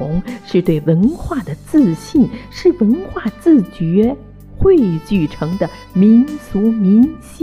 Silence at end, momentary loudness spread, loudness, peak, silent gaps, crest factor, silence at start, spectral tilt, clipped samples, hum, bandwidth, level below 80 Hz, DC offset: 0 s; 10 LU; -15 LUFS; -2 dBFS; none; 12 dB; 0 s; -8.5 dB/octave; under 0.1%; none; 13 kHz; -34 dBFS; under 0.1%